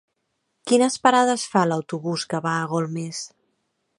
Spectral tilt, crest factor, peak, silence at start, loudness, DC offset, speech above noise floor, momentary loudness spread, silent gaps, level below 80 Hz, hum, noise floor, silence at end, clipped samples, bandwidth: -4.5 dB/octave; 20 dB; -2 dBFS; 0.65 s; -22 LUFS; under 0.1%; 53 dB; 14 LU; none; -74 dBFS; none; -75 dBFS; 0.7 s; under 0.1%; 11.5 kHz